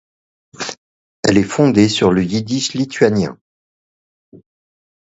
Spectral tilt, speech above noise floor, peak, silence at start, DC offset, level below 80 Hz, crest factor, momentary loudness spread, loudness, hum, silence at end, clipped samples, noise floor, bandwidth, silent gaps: -5.5 dB/octave; over 75 dB; 0 dBFS; 0.6 s; under 0.1%; -48 dBFS; 18 dB; 15 LU; -16 LUFS; none; 0.7 s; under 0.1%; under -90 dBFS; 8.2 kHz; 0.78-1.23 s, 3.41-4.32 s